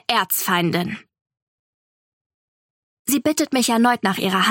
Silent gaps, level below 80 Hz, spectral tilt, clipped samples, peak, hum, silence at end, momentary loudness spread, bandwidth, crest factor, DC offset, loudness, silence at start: 1.21-1.25 s, 1.42-3.05 s; -66 dBFS; -3.5 dB/octave; under 0.1%; -2 dBFS; none; 0 s; 10 LU; 17 kHz; 20 dB; under 0.1%; -19 LUFS; 0.1 s